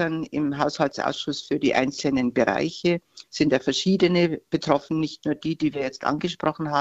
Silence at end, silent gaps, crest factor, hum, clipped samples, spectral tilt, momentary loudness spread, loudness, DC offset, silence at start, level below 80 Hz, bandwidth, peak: 0 s; none; 20 dB; none; under 0.1%; -5.5 dB/octave; 7 LU; -24 LUFS; under 0.1%; 0 s; -56 dBFS; 8.2 kHz; -4 dBFS